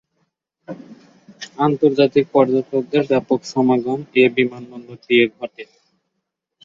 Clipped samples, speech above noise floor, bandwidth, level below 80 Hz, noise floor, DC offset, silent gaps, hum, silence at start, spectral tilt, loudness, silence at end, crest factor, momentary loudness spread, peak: under 0.1%; 60 dB; 7.6 kHz; -64 dBFS; -77 dBFS; under 0.1%; none; none; 0.7 s; -6.5 dB/octave; -17 LUFS; 1 s; 18 dB; 21 LU; -2 dBFS